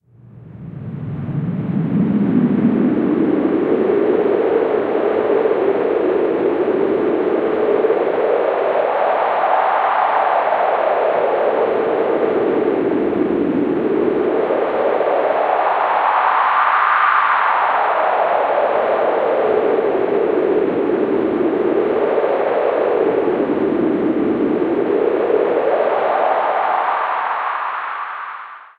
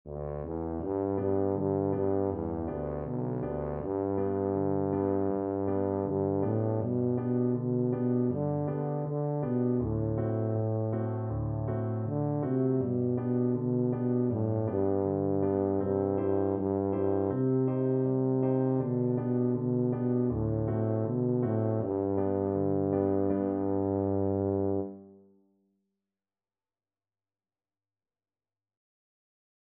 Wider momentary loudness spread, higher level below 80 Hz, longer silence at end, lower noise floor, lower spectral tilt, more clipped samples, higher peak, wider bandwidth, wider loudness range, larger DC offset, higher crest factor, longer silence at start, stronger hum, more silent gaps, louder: about the same, 4 LU vs 5 LU; about the same, -56 dBFS vs -54 dBFS; second, 0.15 s vs 4.55 s; second, -41 dBFS vs under -90 dBFS; second, -9 dB/octave vs -12.5 dB/octave; neither; first, -2 dBFS vs -16 dBFS; first, 4.9 kHz vs 2.8 kHz; about the same, 2 LU vs 3 LU; neither; about the same, 14 dB vs 14 dB; first, 0.25 s vs 0.05 s; neither; neither; first, -17 LUFS vs -30 LUFS